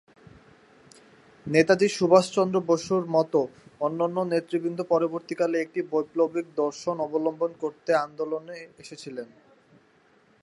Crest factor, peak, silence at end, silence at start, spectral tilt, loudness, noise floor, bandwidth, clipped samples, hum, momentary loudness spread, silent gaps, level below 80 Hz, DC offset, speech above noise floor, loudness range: 22 dB; -4 dBFS; 1.15 s; 1.45 s; -5.5 dB/octave; -25 LUFS; -61 dBFS; 11.5 kHz; under 0.1%; none; 18 LU; none; -70 dBFS; under 0.1%; 36 dB; 7 LU